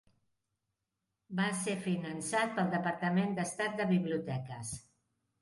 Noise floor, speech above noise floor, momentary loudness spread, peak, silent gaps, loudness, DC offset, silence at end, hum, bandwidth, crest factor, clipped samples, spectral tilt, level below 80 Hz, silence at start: -87 dBFS; 53 dB; 10 LU; -18 dBFS; none; -34 LUFS; under 0.1%; 0.6 s; none; 11.5 kHz; 16 dB; under 0.1%; -5 dB/octave; -70 dBFS; 1.3 s